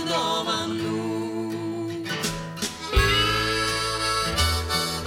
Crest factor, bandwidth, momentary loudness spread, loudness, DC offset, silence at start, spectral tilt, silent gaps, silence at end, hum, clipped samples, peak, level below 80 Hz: 18 dB; 17 kHz; 9 LU; -24 LUFS; under 0.1%; 0 s; -3.5 dB/octave; none; 0 s; none; under 0.1%; -8 dBFS; -34 dBFS